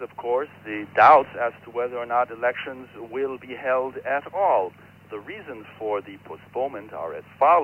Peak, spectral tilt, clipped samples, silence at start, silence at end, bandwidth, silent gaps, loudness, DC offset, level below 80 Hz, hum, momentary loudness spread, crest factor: -4 dBFS; -6.5 dB/octave; under 0.1%; 0 s; 0 s; 6.4 kHz; none; -23 LUFS; under 0.1%; -68 dBFS; none; 19 LU; 20 dB